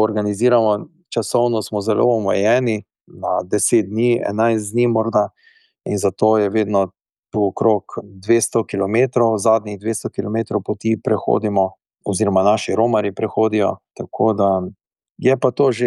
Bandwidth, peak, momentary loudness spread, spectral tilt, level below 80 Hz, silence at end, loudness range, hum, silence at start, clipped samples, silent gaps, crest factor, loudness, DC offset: 12.5 kHz; -4 dBFS; 8 LU; -5.5 dB/octave; -64 dBFS; 0 s; 1 LU; none; 0 s; under 0.1%; 7.19-7.23 s, 15.11-15.15 s; 14 dB; -18 LUFS; under 0.1%